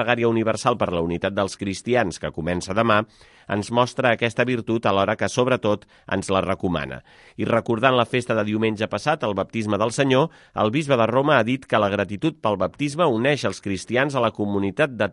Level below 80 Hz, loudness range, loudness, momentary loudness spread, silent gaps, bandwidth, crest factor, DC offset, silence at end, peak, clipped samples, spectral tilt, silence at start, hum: -48 dBFS; 2 LU; -22 LUFS; 7 LU; none; 11.5 kHz; 20 dB; under 0.1%; 0 s; -2 dBFS; under 0.1%; -5.5 dB/octave; 0 s; none